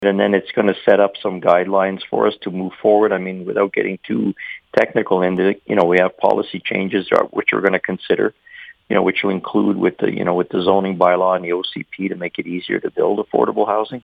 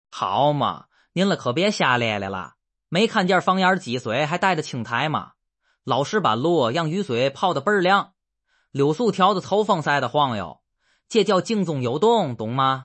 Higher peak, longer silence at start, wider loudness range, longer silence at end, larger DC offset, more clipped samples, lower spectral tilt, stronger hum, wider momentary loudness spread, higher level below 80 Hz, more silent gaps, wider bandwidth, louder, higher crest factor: first, 0 dBFS vs -4 dBFS; second, 0 s vs 0.15 s; about the same, 2 LU vs 2 LU; about the same, 0.05 s vs 0 s; neither; neither; first, -8 dB/octave vs -5.5 dB/octave; neither; about the same, 8 LU vs 8 LU; first, -62 dBFS vs -68 dBFS; neither; second, 6.2 kHz vs 8.8 kHz; first, -18 LUFS vs -21 LUFS; about the same, 18 dB vs 18 dB